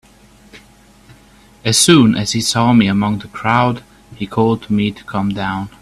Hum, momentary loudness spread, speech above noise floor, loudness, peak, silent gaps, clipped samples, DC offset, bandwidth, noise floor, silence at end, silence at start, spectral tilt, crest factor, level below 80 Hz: none; 13 LU; 32 dB; -15 LUFS; 0 dBFS; none; under 0.1%; under 0.1%; 14.5 kHz; -46 dBFS; 0.15 s; 0.55 s; -4.5 dB/octave; 16 dB; -46 dBFS